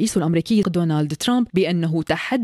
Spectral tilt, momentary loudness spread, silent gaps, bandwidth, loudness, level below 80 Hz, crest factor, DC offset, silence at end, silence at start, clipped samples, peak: -6 dB/octave; 3 LU; none; 13.5 kHz; -20 LUFS; -52 dBFS; 12 dB; under 0.1%; 0 s; 0 s; under 0.1%; -6 dBFS